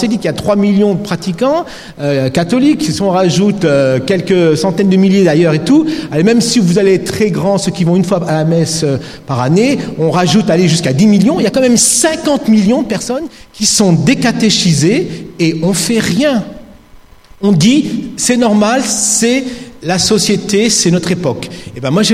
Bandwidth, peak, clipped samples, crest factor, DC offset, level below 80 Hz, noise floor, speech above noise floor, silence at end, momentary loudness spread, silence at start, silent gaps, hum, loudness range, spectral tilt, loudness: 15 kHz; 0 dBFS; under 0.1%; 12 dB; under 0.1%; -44 dBFS; -39 dBFS; 28 dB; 0 s; 8 LU; 0 s; none; none; 3 LU; -4.5 dB/octave; -11 LUFS